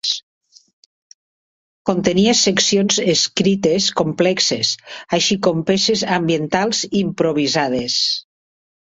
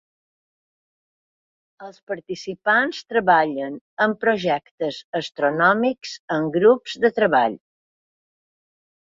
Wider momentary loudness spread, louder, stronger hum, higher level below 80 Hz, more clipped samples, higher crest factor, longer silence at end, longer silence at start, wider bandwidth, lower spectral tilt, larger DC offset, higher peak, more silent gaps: second, 7 LU vs 13 LU; first, -17 LUFS vs -20 LUFS; neither; first, -54 dBFS vs -66 dBFS; neither; about the same, 18 dB vs 20 dB; second, 0.6 s vs 1.45 s; second, 0.05 s vs 1.8 s; about the same, 8 kHz vs 7.6 kHz; second, -3.5 dB/octave vs -5.5 dB/octave; neither; about the same, 0 dBFS vs -2 dBFS; first, 0.23-0.41 s, 0.73-1.85 s vs 2.03-2.07 s, 3.81-3.97 s, 4.71-4.78 s, 5.04-5.13 s, 6.19-6.28 s